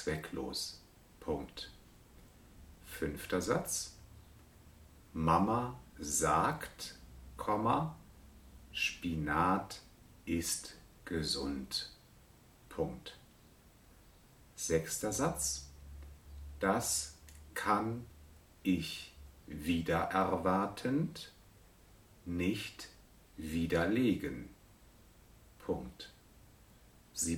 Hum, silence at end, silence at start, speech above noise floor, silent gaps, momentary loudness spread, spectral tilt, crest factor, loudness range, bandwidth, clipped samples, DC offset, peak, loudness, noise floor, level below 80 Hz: none; 0 s; 0 s; 27 dB; none; 20 LU; -4 dB/octave; 24 dB; 6 LU; 19 kHz; under 0.1%; under 0.1%; -14 dBFS; -36 LUFS; -62 dBFS; -56 dBFS